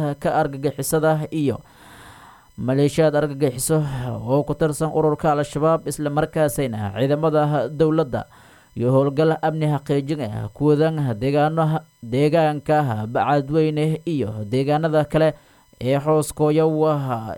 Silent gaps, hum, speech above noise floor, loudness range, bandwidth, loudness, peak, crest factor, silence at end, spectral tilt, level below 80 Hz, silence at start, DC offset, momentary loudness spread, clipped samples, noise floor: none; none; 26 dB; 2 LU; 17 kHz; -21 LUFS; -4 dBFS; 16 dB; 0 s; -6.5 dB/octave; -48 dBFS; 0 s; under 0.1%; 7 LU; under 0.1%; -46 dBFS